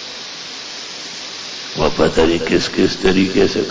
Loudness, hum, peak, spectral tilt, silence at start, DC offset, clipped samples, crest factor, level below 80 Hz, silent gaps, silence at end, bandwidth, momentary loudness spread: -18 LUFS; none; -4 dBFS; -4.5 dB/octave; 0 s; under 0.1%; under 0.1%; 14 dB; -38 dBFS; none; 0 s; 8 kHz; 13 LU